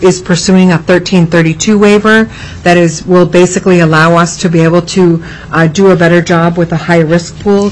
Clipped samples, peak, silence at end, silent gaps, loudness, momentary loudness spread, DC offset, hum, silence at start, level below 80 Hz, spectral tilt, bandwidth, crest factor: 0.3%; 0 dBFS; 0 s; none; -8 LUFS; 5 LU; under 0.1%; none; 0 s; -34 dBFS; -5.5 dB/octave; 10.5 kHz; 8 dB